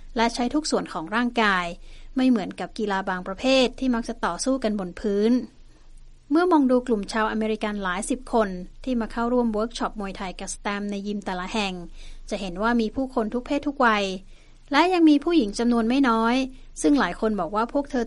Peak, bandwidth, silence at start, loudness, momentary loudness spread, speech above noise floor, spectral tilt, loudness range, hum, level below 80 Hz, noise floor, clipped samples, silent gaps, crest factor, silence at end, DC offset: -4 dBFS; 11.5 kHz; 0 s; -24 LUFS; 11 LU; 22 dB; -4.5 dB/octave; 6 LU; none; -42 dBFS; -45 dBFS; under 0.1%; none; 18 dB; 0 s; under 0.1%